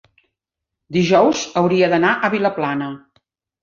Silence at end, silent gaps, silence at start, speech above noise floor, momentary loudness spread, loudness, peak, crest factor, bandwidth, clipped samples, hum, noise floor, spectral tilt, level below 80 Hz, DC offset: 0.65 s; none; 0.9 s; 66 dB; 11 LU; -17 LUFS; -2 dBFS; 16 dB; 7.4 kHz; under 0.1%; none; -82 dBFS; -5.5 dB/octave; -58 dBFS; under 0.1%